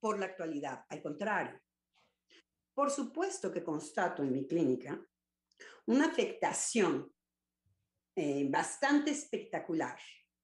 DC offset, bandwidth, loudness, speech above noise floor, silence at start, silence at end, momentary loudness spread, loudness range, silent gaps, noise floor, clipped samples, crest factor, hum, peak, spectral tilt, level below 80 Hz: under 0.1%; 12 kHz; -35 LUFS; over 55 dB; 0.05 s; 0.3 s; 13 LU; 5 LU; none; under -90 dBFS; under 0.1%; 18 dB; none; -18 dBFS; -4 dB/octave; -84 dBFS